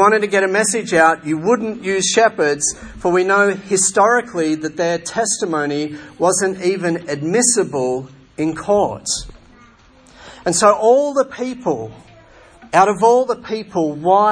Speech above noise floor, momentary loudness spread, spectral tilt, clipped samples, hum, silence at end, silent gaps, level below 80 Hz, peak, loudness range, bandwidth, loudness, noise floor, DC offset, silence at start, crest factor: 31 dB; 10 LU; -3.5 dB/octave; under 0.1%; none; 0 s; none; -50 dBFS; 0 dBFS; 3 LU; 10.5 kHz; -16 LUFS; -47 dBFS; under 0.1%; 0 s; 16 dB